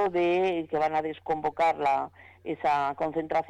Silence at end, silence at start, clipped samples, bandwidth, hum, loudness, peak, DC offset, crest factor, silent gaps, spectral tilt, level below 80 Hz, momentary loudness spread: 0.05 s; 0 s; under 0.1%; 9.4 kHz; none; -28 LUFS; -18 dBFS; under 0.1%; 8 dB; none; -6.5 dB/octave; -64 dBFS; 7 LU